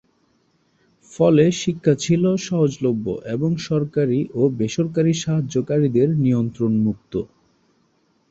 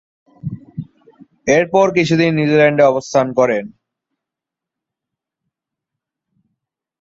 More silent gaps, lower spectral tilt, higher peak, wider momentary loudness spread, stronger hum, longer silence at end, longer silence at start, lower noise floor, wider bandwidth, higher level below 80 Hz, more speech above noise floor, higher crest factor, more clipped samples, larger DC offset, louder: neither; about the same, -7 dB/octave vs -6 dB/octave; about the same, -2 dBFS vs -2 dBFS; second, 6 LU vs 19 LU; neither; second, 1.05 s vs 3.3 s; first, 1.1 s vs 0.45 s; second, -63 dBFS vs -85 dBFS; about the same, 8 kHz vs 7.8 kHz; about the same, -54 dBFS vs -58 dBFS; second, 44 dB vs 71 dB; about the same, 18 dB vs 16 dB; neither; neither; second, -20 LUFS vs -14 LUFS